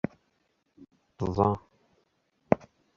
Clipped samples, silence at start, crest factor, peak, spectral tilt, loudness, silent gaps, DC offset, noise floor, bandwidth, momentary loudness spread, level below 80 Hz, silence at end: under 0.1%; 1.2 s; 30 dB; -2 dBFS; -9 dB/octave; -30 LUFS; none; under 0.1%; -74 dBFS; 7.2 kHz; 10 LU; -52 dBFS; 0.4 s